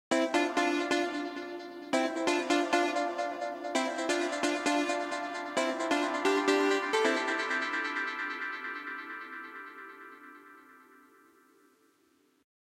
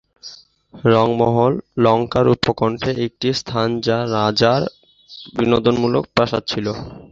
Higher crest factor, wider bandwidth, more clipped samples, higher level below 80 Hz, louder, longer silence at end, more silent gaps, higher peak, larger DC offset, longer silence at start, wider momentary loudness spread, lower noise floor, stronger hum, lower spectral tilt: first, 22 dB vs 16 dB; first, 15.5 kHz vs 7.8 kHz; neither; second, -78 dBFS vs -46 dBFS; second, -31 LUFS vs -18 LUFS; first, 1.95 s vs 0.05 s; neither; second, -10 dBFS vs -2 dBFS; neither; second, 0.1 s vs 0.25 s; first, 15 LU vs 12 LU; first, -69 dBFS vs -41 dBFS; neither; second, -2 dB/octave vs -6.5 dB/octave